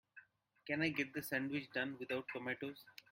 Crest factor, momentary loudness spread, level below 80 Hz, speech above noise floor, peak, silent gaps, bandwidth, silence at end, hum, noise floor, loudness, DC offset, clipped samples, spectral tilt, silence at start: 22 dB; 10 LU; -80 dBFS; 23 dB; -22 dBFS; none; 16.5 kHz; 0.2 s; none; -65 dBFS; -41 LUFS; under 0.1%; under 0.1%; -5 dB/octave; 0.15 s